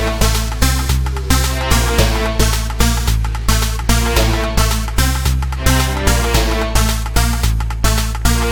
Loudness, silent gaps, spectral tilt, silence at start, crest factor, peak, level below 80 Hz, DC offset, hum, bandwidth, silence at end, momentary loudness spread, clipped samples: -16 LUFS; none; -4 dB/octave; 0 s; 14 dB; 0 dBFS; -16 dBFS; under 0.1%; none; 19.5 kHz; 0 s; 3 LU; under 0.1%